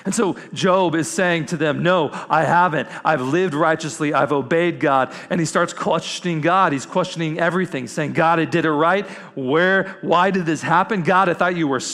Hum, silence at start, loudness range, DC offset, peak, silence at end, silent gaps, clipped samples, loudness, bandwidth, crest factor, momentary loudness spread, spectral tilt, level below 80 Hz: none; 0.05 s; 2 LU; under 0.1%; -4 dBFS; 0 s; none; under 0.1%; -19 LUFS; 14 kHz; 16 dB; 6 LU; -5 dB/octave; -62 dBFS